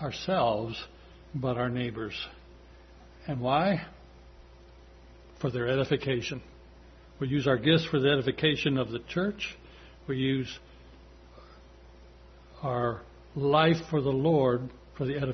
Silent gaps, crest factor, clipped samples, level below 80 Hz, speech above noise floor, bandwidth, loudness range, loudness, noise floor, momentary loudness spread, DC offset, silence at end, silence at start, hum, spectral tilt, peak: none; 20 dB; under 0.1%; -54 dBFS; 24 dB; 6.4 kHz; 7 LU; -29 LUFS; -52 dBFS; 17 LU; under 0.1%; 0 s; 0 s; none; -6.5 dB/octave; -10 dBFS